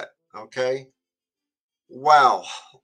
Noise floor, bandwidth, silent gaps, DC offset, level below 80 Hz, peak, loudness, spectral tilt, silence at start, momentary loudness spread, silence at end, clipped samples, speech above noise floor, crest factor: under -90 dBFS; 10.5 kHz; 1.60-1.69 s; under 0.1%; -82 dBFS; -2 dBFS; -19 LUFS; -3 dB/octave; 0 s; 20 LU; 0.25 s; under 0.1%; over 70 dB; 22 dB